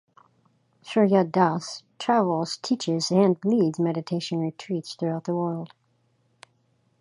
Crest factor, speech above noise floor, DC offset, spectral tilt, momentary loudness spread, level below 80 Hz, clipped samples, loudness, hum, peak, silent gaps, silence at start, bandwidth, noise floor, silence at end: 20 dB; 44 dB; under 0.1%; -6 dB/octave; 11 LU; -72 dBFS; under 0.1%; -25 LUFS; none; -6 dBFS; none; 0.85 s; 11.5 kHz; -68 dBFS; 1.35 s